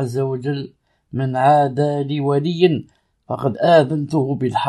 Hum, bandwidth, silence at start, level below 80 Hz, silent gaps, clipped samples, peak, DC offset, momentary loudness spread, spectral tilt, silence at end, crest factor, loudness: none; 11.5 kHz; 0 s; -60 dBFS; none; under 0.1%; -2 dBFS; under 0.1%; 12 LU; -7.5 dB/octave; 0 s; 16 dB; -18 LUFS